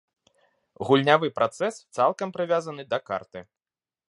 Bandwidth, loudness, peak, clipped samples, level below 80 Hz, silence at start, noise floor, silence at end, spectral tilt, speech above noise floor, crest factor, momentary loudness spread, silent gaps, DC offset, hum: 11.5 kHz; -25 LUFS; -4 dBFS; under 0.1%; -70 dBFS; 0.8 s; under -90 dBFS; 0.65 s; -5.5 dB/octave; over 65 dB; 24 dB; 14 LU; none; under 0.1%; none